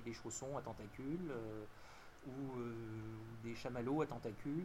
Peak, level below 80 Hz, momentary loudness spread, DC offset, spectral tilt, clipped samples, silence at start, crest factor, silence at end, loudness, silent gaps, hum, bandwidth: -28 dBFS; -64 dBFS; 12 LU; under 0.1%; -6 dB/octave; under 0.1%; 0 s; 18 dB; 0 s; -46 LUFS; none; none; 16 kHz